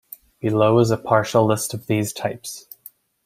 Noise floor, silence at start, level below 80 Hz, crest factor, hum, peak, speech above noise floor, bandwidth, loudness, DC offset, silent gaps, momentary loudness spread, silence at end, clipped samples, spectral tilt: -48 dBFS; 0.45 s; -58 dBFS; 20 dB; none; -2 dBFS; 29 dB; 16 kHz; -20 LUFS; under 0.1%; none; 17 LU; 0.65 s; under 0.1%; -5.5 dB/octave